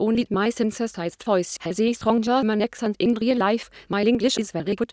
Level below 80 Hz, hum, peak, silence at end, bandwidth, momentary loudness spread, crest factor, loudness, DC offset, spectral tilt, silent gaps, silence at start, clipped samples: -56 dBFS; none; -6 dBFS; 0.05 s; 8 kHz; 7 LU; 18 dB; -23 LUFS; under 0.1%; -5 dB/octave; none; 0 s; under 0.1%